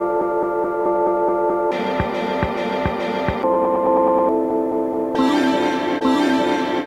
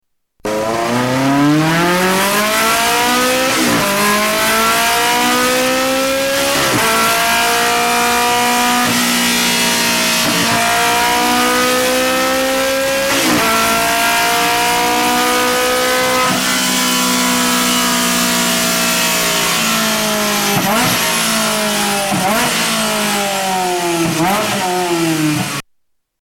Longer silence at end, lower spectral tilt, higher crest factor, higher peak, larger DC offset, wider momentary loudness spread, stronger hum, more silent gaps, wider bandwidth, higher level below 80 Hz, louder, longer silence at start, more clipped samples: second, 0 s vs 0.6 s; first, -6 dB/octave vs -2.5 dB/octave; about the same, 14 dB vs 12 dB; about the same, -4 dBFS vs -2 dBFS; neither; about the same, 5 LU vs 3 LU; neither; neither; about the same, 15.5 kHz vs 16.5 kHz; about the same, -42 dBFS vs -44 dBFS; second, -19 LUFS vs -13 LUFS; second, 0 s vs 0.45 s; neither